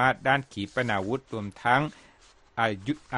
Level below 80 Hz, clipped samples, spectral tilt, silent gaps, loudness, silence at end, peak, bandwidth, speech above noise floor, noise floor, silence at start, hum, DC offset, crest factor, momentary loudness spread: -58 dBFS; under 0.1%; -6 dB/octave; none; -28 LUFS; 0 s; -8 dBFS; 11.5 kHz; 30 dB; -58 dBFS; 0 s; none; under 0.1%; 20 dB; 10 LU